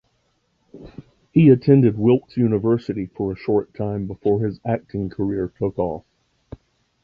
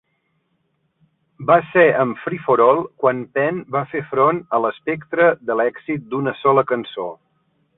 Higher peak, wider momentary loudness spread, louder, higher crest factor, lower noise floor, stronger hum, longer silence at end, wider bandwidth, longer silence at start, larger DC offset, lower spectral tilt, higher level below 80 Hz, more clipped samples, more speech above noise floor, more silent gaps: about the same, -2 dBFS vs -2 dBFS; about the same, 13 LU vs 11 LU; about the same, -20 LUFS vs -18 LUFS; about the same, 18 dB vs 18 dB; about the same, -67 dBFS vs -68 dBFS; neither; first, 1.05 s vs 0.65 s; first, 5.4 kHz vs 4 kHz; second, 0.75 s vs 1.4 s; neither; about the same, -11 dB/octave vs -11 dB/octave; first, -48 dBFS vs -62 dBFS; neither; about the same, 48 dB vs 50 dB; neither